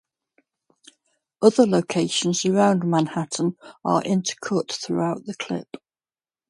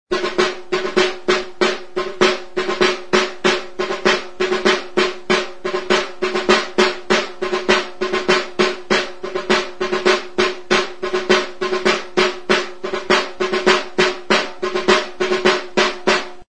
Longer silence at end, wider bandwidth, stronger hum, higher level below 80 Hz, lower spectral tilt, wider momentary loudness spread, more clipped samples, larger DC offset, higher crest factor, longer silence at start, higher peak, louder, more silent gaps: first, 0.85 s vs 0 s; about the same, 11.5 kHz vs 10.5 kHz; neither; second, -68 dBFS vs -50 dBFS; first, -5 dB/octave vs -3 dB/octave; first, 11 LU vs 6 LU; neither; second, under 0.1% vs 2%; about the same, 22 dB vs 18 dB; first, 1.4 s vs 0.05 s; about the same, -2 dBFS vs 0 dBFS; second, -22 LUFS vs -18 LUFS; neither